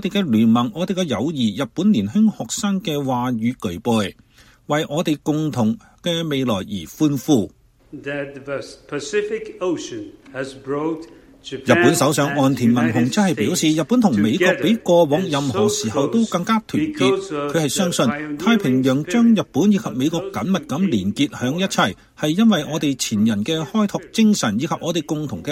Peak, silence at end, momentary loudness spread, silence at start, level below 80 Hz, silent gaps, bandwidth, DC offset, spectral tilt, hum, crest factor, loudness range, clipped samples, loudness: 0 dBFS; 0 s; 11 LU; 0 s; -56 dBFS; none; 16.5 kHz; under 0.1%; -5 dB/octave; none; 20 dB; 6 LU; under 0.1%; -19 LUFS